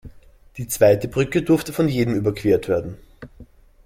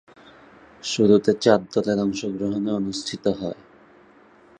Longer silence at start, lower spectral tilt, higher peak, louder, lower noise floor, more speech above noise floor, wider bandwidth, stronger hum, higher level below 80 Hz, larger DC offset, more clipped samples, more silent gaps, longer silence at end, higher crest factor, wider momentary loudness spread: second, 0.05 s vs 0.85 s; about the same, -6 dB/octave vs -5.5 dB/octave; about the same, -2 dBFS vs -2 dBFS; about the same, -20 LUFS vs -22 LUFS; second, -47 dBFS vs -52 dBFS; second, 27 dB vs 31 dB; first, 16.5 kHz vs 9.8 kHz; neither; first, -46 dBFS vs -58 dBFS; neither; neither; neither; second, 0.4 s vs 1.05 s; about the same, 18 dB vs 22 dB; about the same, 14 LU vs 13 LU